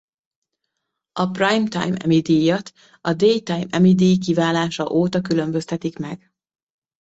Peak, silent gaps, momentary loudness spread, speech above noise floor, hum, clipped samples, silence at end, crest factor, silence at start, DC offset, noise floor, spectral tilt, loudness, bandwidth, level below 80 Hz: -4 dBFS; none; 11 LU; 60 dB; none; under 0.1%; 0.85 s; 16 dB; 1.15 s; under 0.1%; -79 dBFS; -6.5 dB/octave; -19 LUFS; 8 kHz; -58 dBFS